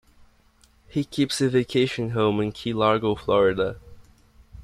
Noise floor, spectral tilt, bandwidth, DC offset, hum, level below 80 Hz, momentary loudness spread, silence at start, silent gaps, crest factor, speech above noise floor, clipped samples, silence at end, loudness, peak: -59 dBFS; -6 dB/octave; 13.5 kHz; under 0.1%; none; -52 dBFS; 8 LU; 0.95 s; none; 18 dB; 36 dB; under 0.1%; 0 s; -23 LUFS; -6 dBFS